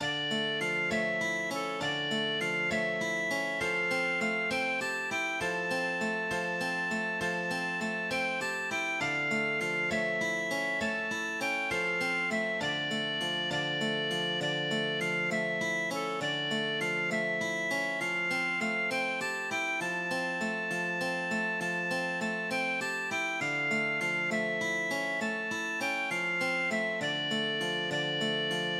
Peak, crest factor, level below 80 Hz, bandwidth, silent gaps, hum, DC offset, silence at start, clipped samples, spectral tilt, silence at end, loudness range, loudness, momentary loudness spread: -18 dBFS; 14 dB; -70 dBFS; 16 kHz; none; none; under 0.1%; 0 s; under 0.1%; -3.5 dB/octave; 0 s; 1 LU; -30 LUFS; 3 LU